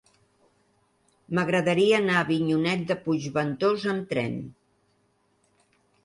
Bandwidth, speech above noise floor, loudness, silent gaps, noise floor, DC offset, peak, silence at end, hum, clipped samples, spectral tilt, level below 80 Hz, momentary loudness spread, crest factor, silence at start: 11.5 kHz; 44 dB; -25 LUFS; none; -68 dBFS; under 0.1%; -8 dBFS; 1.55 s; none; under 0.1%; -6 dB/octave; -66 dBFS; 9 LU; 18 dB; 1.3 s